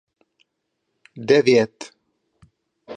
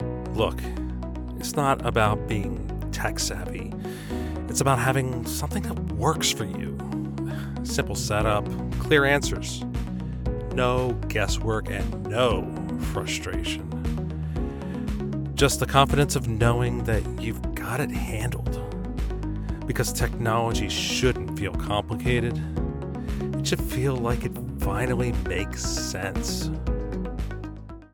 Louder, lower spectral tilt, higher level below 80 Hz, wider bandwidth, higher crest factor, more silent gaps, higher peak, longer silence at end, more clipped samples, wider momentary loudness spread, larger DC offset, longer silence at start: first, -18 LUFS vs -26 LUFS; about the same, -5.5 dB/octave vs -5 dB/octave; second, -68 dBFS vs -34 dBFS; second, 9.8 kHz vs 18 kHz; about the same, 20 dB vs 22 dB; neither; about the same, -2 dBFS vs -4 dBFS; about the same, 0 s vs 0.05 s; neither; first, 25 LU vs 9 LU; neither; first, 1.15 s vs 0 s